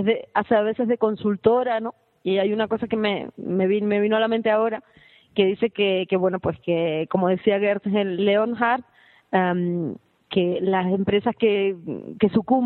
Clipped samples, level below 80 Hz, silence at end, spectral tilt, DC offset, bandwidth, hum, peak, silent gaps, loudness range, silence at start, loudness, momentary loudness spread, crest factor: under 0.1%; -60 dBFS; 0 s; -10 dB/octave; under 0.1%; 4.3 kHz; none; -4 dBFS; none; 1 LU; 0 s; -22 LUFS; 7 LU; 18 dB